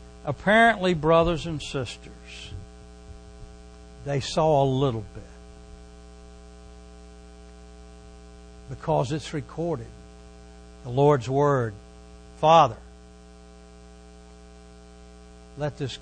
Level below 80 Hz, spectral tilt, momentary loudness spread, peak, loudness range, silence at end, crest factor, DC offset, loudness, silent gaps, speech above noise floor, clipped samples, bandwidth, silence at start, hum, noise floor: -46 dBFS; -6 dB/octave; 28 LU; -4 dBFS; 16 LU; 0 s; 22 dB; under 0.1%; -23 LUFS; none; 25 dB; under 0.1%; 9.8 kHz; 0 s; 60 Hz at -45 dBFS; -48 dBFS